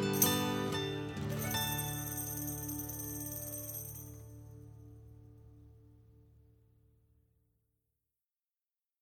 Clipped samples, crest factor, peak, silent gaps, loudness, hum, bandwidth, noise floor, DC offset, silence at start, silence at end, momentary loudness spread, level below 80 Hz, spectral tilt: under 0.1%; 28 dB; -12 dBFS; none; -36 LUFS; none; 19.5 kHz; under -90 dBFS; under 0.1%; 0 s; 2.8 s; 23 LU; -60 dBFS; -3.5 dB/octave